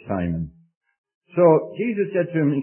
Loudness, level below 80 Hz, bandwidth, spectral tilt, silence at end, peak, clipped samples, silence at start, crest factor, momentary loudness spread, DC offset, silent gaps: -21 LUFS; -50 dBFS; 3.2 kHz; -13 dB/octave; 0 s; -4 dBFS; under 0.1%; 0.05 s; 18 dB; 13 LU; under 0.1%; 0.76-0.81 s, 0.98-1.04 s, 1.15-1.21 s